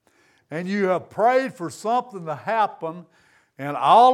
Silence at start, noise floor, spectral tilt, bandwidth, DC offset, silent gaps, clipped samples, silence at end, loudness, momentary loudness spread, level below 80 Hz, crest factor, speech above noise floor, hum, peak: 0.5 s; -61 dBFS; -5.5 dB/octave; 13.5 kHz; under 0.1%; none; under 0.1%; 0 s; -22 LUFS; 15 LU; -76 dBFS; 18 dB; 40 dB; none; -4 dBFS